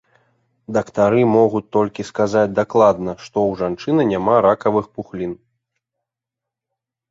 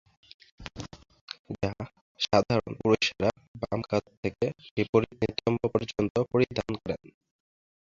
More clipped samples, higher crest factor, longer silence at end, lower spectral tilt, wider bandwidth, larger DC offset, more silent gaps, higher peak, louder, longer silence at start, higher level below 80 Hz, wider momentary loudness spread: neither; second, 18 dB vs 24 dB; first, 1.75 s vs 0.95 s; about the same, -7 dB/octave vs -6 dB/octave; about the same, 7.8 kHz vs 7.6 kHz; neither; second, none vs 1.21-1.28 s, 1.39-1.45 s, 2.01-2.15 s, 3.48-3.55 s, 4.17-4.23 s, 4.71-4.77 s, 4.89-4.93 s, 6.10-6.15 s; first, -2 dBFS vs -6 dBFS; first, -18 LUFS vs -29 LUFS; about the same, 0.7 s vs 0.6 s; about the same, -54 dBFS vs -54 dBFS; second, 13 LU vs 17 LU